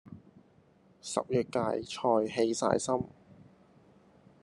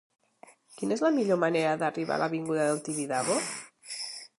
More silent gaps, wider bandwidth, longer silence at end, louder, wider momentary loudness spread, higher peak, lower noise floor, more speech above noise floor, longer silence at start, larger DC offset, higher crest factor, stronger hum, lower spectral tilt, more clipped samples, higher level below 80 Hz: neither; about the same, 11.5 kHz vs 11.5 kHz; first, 1.1 s vs 0.15 s; about the same, -31 LUFS vs -29 LUFS; first, 16 LU vs 11 LU; about the same, -10 dBFS vs -12 dBFS; first, -63 dBFS vs -57 dBFS; first, 33 dB vs 29 dB; second, 0.05 s vs 0.7 s; neither; first, 24 dB vs 18 dB; neither; about the same, -5 dB/octave vs -4 dB/octave; neither; first, -68 dBFS vs -80 dBFS